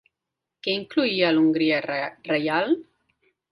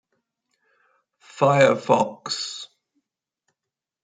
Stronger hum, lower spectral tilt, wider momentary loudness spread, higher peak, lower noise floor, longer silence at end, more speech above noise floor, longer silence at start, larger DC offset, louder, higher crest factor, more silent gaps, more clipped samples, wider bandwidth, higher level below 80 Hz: neither; first, -7 dB/octave vs -4.5 dB/octave; second, 9 LU vs 17 LU; second, -6 dBFS vs -2 dBFS; about the same, -85 dBFS vs -87 dBFS; second, 0.7 s vs 1.4 s; second, 62 dB vs 67 dB; second, 0.65 s vs 1.35 s; neither; about the same, -23 LUFS vs -21 LUFS; about the same, 18 dB vs 22 dB; neither; neither; first, 10.5 kHz vs 9.4 kHz; about the same, -68 dBFS vs -72 dBFS